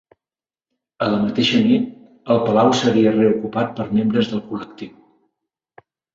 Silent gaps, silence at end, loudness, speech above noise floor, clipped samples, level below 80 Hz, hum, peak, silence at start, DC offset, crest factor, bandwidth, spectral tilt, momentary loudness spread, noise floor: none; 1.25 s; -18 LUFS; over 73 dB; under 0.1%; -56 dBFS; none; -2 dBFS; 1 s; under 0.1%; 18 dB; 7.6 kHz; -6 dB/octave; 16 LU; under -90 dBFS